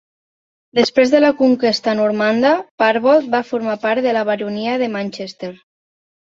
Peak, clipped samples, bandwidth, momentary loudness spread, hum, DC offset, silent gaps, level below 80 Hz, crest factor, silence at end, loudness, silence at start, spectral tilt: -2 dBFS; under 0.1%; 7.6 kHz; 11 LU; none; under 0.1%; 2.71-2.78 s; -62 dBFS; 16 dB; 0.85 s; -16 LUFS; 0.75 s; -5 dB/octave